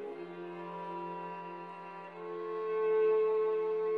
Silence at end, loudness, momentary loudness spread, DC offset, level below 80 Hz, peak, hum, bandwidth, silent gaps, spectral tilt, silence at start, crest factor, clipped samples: 0 s; -34 LUFS; 16 LU; under 0.1%; under -90 dBFS; -22 dBFS; none; 4.8 kHz; none; -7.5 dB/octave; 0 s; 12 dB; under 0.1%